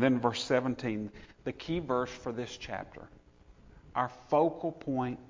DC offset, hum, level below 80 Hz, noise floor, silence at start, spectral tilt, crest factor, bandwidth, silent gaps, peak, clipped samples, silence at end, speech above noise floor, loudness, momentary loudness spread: under 0.1%; none; -58 dBFS; -58 dBFS; 0 s; -6 dB/octave; 20 dB; 7.6 kHz; none; -12 dBFS; under 0.1%; 0.05 s; 26 dB; -33 LUFS; 13 LU